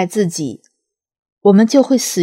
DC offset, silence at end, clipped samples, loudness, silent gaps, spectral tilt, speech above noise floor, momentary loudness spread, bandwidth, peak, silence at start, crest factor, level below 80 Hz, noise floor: under 0.1%; 0 s; under 0.1%; -14 LUFS; 1.19-1.23 s, 1.32-1.37 s; -5.5 dB/octave; 61 dB; 12 LU; 16.5 kHz; 0 dBFS; 0 s; 16 dB; -68 dBFS; -74 dBFS